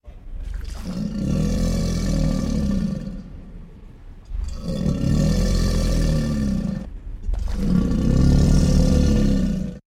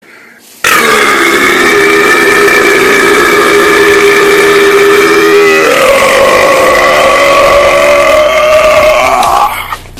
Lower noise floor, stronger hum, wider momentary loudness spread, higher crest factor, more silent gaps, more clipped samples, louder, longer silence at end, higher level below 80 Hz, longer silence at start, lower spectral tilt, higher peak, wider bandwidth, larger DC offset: first, -40 dBFS vs -34 dBFS; neither; first, 17 LU vs 2 LU; first, 16 dB vs 6 dB; neither; second, under 0.1% vs 9%; second, -22 LUFS vs -4 LUFS; about the same, 0.1 s vs 0 s; first, -24 dBFS vs -34 dBFS; second, 0.05 s vs 0.65 s; first, -7 dB/octave vs -2.5 dB/octave; second, -4 dBFS vs 0 dBFS; second, 14.5 kHz vs over 20 kHz; neither